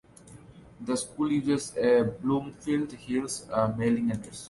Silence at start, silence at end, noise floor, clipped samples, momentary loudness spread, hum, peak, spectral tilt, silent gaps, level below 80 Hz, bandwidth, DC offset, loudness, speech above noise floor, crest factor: 0.25 s; 0 s; -51 dBFS; under 0.1%; 8 LU; none; -14 dBFS; -5.5 dB/octave; none; -58 dBFS; 11.5 kHz; under 0.1%; -28 LUFS; 23 dB; 16 dB